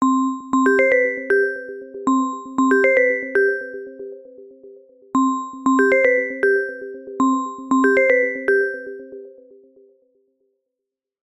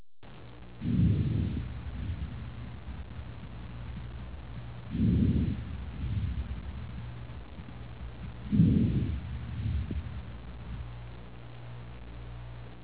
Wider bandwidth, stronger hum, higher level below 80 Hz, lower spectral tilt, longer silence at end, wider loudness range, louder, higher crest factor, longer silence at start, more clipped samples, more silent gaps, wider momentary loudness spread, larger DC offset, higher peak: first, 10.5 kHz vs 4 kHz; neither; second, -66 dBFS vs -40 dBFS; second, -4.5 dB/octave vs -11.5 dB/octave; first, 2 s vs 0 s; second, 3 LU vs 8 LU; first, -18 LUFS vs -33 LUFS; about the same, 16 dB vs 20 dB; about the same, 0 s vs 0 s; neither; neither; about the same, 18 LU vs 19 LU; second, under 0.1% vs 0.4%; first, -4 dBFS vs -12 dBFS